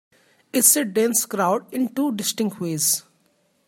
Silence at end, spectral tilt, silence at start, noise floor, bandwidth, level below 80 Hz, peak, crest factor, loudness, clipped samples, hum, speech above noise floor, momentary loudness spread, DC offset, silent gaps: 0.65 s; -3 dB/octave; 0.55 s; -65 dBFS; 16.5 kHz; -72 dBFS; -2 dBFS; 20 dB; -20 LUFS; under 0.1%; none; 43 dB; 10 LU; under 0.1%; none